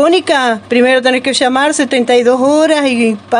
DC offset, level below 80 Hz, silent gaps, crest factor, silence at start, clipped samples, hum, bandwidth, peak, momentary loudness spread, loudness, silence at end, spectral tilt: under 0.1%; -60 dBFS; none; 10 dB; 0 s; under 0.1%; none; 11 kHz; 0 dBFS; 3 LU; -11 LUFS; 0 s; -3 dB/octave